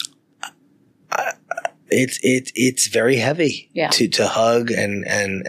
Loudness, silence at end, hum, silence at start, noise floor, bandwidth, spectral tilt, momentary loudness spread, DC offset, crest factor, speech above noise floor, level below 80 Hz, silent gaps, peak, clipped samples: -19 LUFS; 0 s; none; 0 s; -57 dBFS; 15.5 kHz; -3.5 dB/octave; 12 LU; under 0.1%; 18 dB; 38 dB; -70 dBFS; none; -4 dBFS; under 0.1%